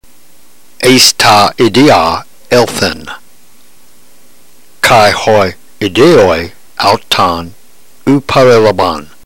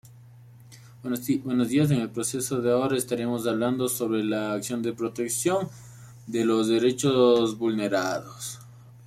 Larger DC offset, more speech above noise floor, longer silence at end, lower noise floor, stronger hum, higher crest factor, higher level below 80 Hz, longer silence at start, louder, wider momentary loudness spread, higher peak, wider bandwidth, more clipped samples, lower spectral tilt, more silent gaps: first, 3% vs under 0.1%; first, 37 dB vs 24 dB; first, 0.2 s vs 0 s; second, -45 dBFS vs -49 dBFS; neither; second, 10 dB vs 16 dB; first, -38 dBFS vs -64 dBFS; about the same, 0 s vs 0.05 s; first, -8 LUFS vs -25 LUFS; about the same, 13 LU vs 12 LU; first, 0 dBFS vs -10 dBFS; about the same, 16 kHz vs 16 kHz; first, 0.5% vs under 0.1%; about the same, -4 dB/octave vs -5 dB/octave; neither